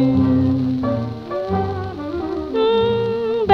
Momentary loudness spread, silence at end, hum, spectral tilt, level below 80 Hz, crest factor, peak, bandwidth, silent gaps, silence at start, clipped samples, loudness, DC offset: 10 LU; 0 s; none; -9 dB/octave; -42 dBFS; 18 dB; 0 dBFS; 6.2 kHz; none; 0 s; under 0.1%; -20 LUFS; under 0.1%